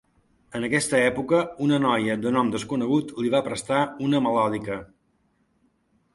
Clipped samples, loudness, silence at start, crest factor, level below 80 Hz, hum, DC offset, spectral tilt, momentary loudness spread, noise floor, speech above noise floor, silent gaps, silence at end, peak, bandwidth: under 0.1%; -24 LUFS; 0.5 s; 18 dB; -60 dBFS; none; under 0.1%; -5 dB/octave; 7 LU; -68 dBFS; 44 dB; none; 1.3 s; -6 dBFS; 11.5 kHz